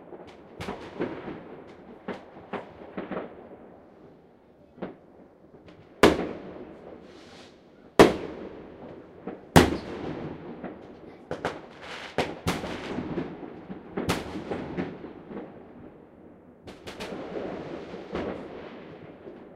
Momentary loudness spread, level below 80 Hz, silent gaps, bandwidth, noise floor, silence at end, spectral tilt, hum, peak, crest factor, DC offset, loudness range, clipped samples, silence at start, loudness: 26 LU; -50 dBFS; none; 16 kHz; -56 dBFS; 0 s; -5.5 dB/octave; none; 0 dBFS; 32 dB; under 0.1%; 16 LU; under 0.1%; 0 s; -29 LUFS